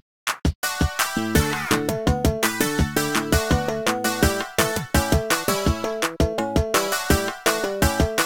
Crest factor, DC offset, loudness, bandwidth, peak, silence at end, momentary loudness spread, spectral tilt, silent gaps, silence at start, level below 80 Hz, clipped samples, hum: 18 dB; 0.4%; -22 LUFS; 18 kHz; -4 dBFS; 0 s; 3 LU; -4 dB/octave; 0.55-0.62 s; 0.25 s; -30 dBFS; under 0.1%; none